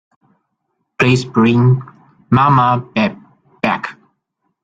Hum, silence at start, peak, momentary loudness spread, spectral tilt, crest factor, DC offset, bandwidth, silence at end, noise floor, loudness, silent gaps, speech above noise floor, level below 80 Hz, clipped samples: none; 1 s; -2 dBFS; 9 LU; -7 dB/octave; 16 dB; under 0.1%; 7.8 kHz; 0.7 s; -71 dBFS; -14 LUFS; none; 58 dB; -50 dBFS; under 0.1%